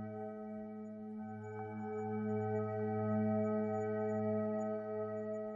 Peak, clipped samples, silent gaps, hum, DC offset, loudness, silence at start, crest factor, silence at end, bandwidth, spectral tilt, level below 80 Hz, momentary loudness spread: -26 dBFS; under 0.1%; none; none; under 0.1%; -39 LUFS; 0 s; 14 dB; 0 s; 7.4 kHz; -10 dB/octave; -80 dBFS; 11 LU